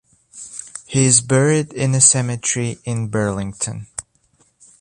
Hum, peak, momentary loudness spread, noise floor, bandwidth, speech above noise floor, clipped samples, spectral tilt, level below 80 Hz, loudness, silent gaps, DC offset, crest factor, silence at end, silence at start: none; 0 dBFS; 20 LU; -59 dBFS; 11 kHz; 42 dB; under 0.1%; -4 dB/octave; -50 dBFS; -16 LUFS; none; under 0.1%; 18 dB; 0.8 s; 0.35 s